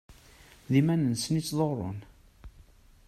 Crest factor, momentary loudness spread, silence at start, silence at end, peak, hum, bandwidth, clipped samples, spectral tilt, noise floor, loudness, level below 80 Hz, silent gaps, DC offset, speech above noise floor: 20 dB; 12 LU; 0.1 s; 0.45 s; -12 dBFS; none; 14.5 kHz; under 0.1%; -6 dB/octave; -56 dBFS; -28 LUFS; -56 dBFS; none; under 0.1%; 29 dB